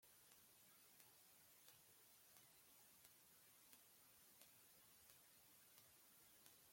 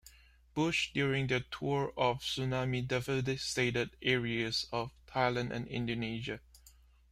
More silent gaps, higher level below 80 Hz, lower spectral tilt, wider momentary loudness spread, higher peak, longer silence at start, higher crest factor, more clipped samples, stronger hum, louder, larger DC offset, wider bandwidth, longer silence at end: neither; second, under -90 dBFS vs -58 dBFS; second, -1 dB/octave vs -5 dB/octave; second, 1 LU vs 7 LU; second, -42 dBFS vs -14 dBFS; about the same, 0 s vs 0.05 s; first, 30 dB vs 20 dB; neither; neither; second, -68 LUFS vs -34 LUFS; neither; about the same, 16.5 kHz vs 15 kHz; second, 0 s vs 0.4 s